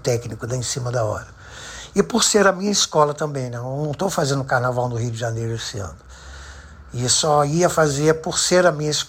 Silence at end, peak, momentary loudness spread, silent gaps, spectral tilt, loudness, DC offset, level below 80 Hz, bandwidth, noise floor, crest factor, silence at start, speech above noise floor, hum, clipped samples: 0 s; -4 dBFS; 19 LU; none; -4 dB/octave; -20 LUFS; under 0.1%; -46 dBFS; 16 kHz; -40 dBFS; 18 dB; 0.05 s; 20 dB; none; under 0.1%